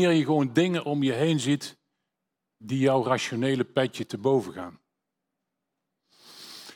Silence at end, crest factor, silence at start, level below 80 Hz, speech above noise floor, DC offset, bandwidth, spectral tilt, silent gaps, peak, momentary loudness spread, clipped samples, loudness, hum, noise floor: 0 s; 20 dB; 0 s; -74 dBFS; 59 dB; under 0.1%; 16.5 kHz; -6 dB/octave; none; -8 dBFS; 17 LU; under 0.1%; -25 LUFS; none; -84 dBFS